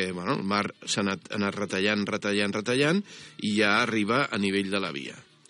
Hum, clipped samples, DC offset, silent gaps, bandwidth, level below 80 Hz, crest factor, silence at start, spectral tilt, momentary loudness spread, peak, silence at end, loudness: none; under 0.1%; under 0.1%; none; 10.5 kHz; -76 dBFS; 18 dB; 0 s; -4.5 dB/octave; 7 LU; -8 dBFS; 0.25 s; -26 LUFS